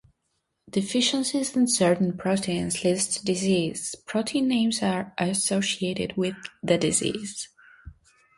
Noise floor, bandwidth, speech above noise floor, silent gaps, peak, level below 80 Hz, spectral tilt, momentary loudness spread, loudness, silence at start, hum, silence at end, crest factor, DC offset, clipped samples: -76 dBFS; 11.5 kHz; 51 dB; none; -8 dBFS; -58 dBFS; -4 dB/octave; 8 LU; -25 LUFS; 0.75 s; none; 0.45 s; 18 dB; under 0.1%; under 0.1%